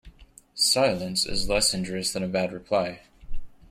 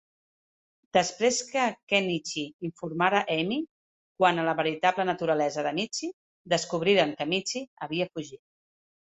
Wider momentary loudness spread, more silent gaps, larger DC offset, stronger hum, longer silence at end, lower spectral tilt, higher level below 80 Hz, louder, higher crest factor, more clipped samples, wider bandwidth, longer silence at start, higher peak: second, 7 LU vs 10 LU; second, none vs 1.83-1.87 s, 2.54-2.59 s, 3.69-4.15 s, 6.13-6.45 s, 7.67-7.77 s; neither; neither; second, 0.2 s vs 0.85 s; about the same, -2.5 dB/octave vs -3.5 dB/octave; first, -42 dBFS vs -72 dBFS; about the same, -25 LUFS vs -27 LUFS; about the same, 18 dB vs 22 dB; neither; first, 16.5 kHz vs 8.4 kHz; second, 0.05 s vs 0.95 s; second, -10 dBFS vs -6 dBFS